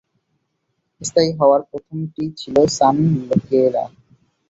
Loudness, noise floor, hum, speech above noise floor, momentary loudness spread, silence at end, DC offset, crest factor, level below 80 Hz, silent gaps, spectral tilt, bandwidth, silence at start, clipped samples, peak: -17 LUFS; -72 dBFS; none; 55 dB; 14 LU; 0.65 s; under 0.1%; 16 dB; -54 dBFS; none; -6 dB/octave; 8 kHz; 1 s; under 0.1%; -2 dBFS